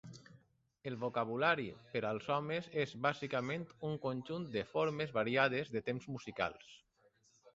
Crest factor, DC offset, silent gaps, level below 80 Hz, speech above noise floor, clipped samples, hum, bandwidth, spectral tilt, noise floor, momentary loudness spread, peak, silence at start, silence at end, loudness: 22 dB; under 0.1%; none; -74 dBFS; 35 dB; under 0.1%; none; 7.8 kHz; -4 dB/octave; -73 dBFS; 10 LU; -16 dBFS; 0.05 s; 0.05 s; -38 LUFS